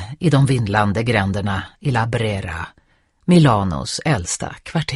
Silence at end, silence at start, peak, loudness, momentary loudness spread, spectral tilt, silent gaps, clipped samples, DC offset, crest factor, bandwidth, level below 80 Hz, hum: 0 s; 0 s; 0 dBFS; -19 LUFS; 11 LU; -5.5 dB/octave; none; under 0.1%; under 0.1%; 18 dB; 11.5 kHz; -42 dBFS; none